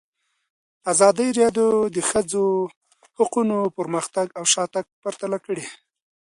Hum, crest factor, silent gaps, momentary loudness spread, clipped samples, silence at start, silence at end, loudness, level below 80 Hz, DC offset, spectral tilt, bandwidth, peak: none; 20 dB; 2.76-2.81 s, 4.92-5.02 s; 13 LU; under 0.1%; 0.85 s; 0.45 s; -21 LUFS; -64 dBFS; under 0.1%; -3.5 dB/octave; 11.5 kHz; -2 dBFS